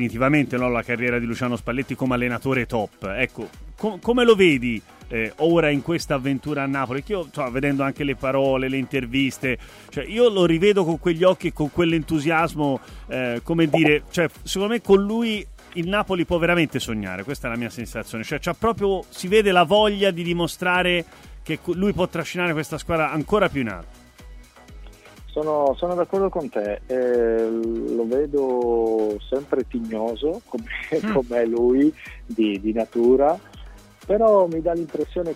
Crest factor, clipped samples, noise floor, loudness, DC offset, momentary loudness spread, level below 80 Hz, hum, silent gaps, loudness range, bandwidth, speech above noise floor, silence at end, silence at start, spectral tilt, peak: 18 dB; under 0.1%; -43 dBFS; -22 LUFS; under 0.1%; 11 LU; -44 dBFS; none; none; 4 LU; 16 kHz; 22 dB; 0 s; 0 s; -6 dB/octave; -4 dBFS